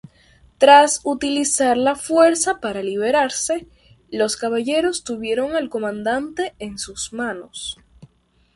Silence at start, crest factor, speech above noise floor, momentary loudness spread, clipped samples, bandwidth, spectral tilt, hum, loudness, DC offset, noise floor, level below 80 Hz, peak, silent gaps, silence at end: 0.6 s; 20 dB; 40 dB; 15 LU; under 0.1%; 11.5 kHz; -2.5 dB/octave; none; -19 LUFS; under 0.1%; -59 dBFS; -54 dBFS; 0 dBFS; none; 0.5 s